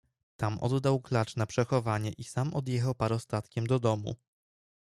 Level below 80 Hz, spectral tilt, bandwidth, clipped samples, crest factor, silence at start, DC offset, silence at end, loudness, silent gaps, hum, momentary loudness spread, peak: -62 dBFS; -7 dB/octave; 12 kHz; under 0.1%; 18 dB; 0.4 s; under 0.1%; 0.7 s; -31 LUFS; none; none; 6 LU; -14 dBFS